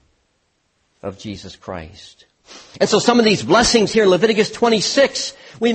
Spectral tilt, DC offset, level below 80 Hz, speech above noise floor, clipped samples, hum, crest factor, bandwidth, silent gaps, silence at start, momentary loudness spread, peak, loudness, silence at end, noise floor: -3.5 dB/octave; under 0.1%; -46 dBFS; 49 dB; under 0.1%; none; 18 dB; 8.8 kHz; none; 1.05 s; 18 LU; 0 dBFS; -15 LUFS; 0 s; -66 dBFS